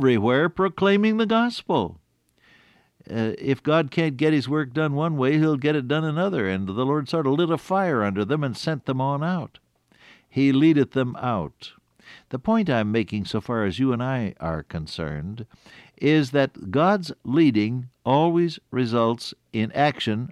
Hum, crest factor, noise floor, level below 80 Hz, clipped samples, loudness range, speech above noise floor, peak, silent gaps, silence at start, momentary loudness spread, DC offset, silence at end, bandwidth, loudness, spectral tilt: none; 16 dB; -62 dBFS; -54 dBFS; under 0.1%; 3 LU; 39 dB; -8 dBFS; none; 0 s; 11 LU; under 0.1%; 0 s; 12 kHz; -23 LUFS; -7.5 dB/octave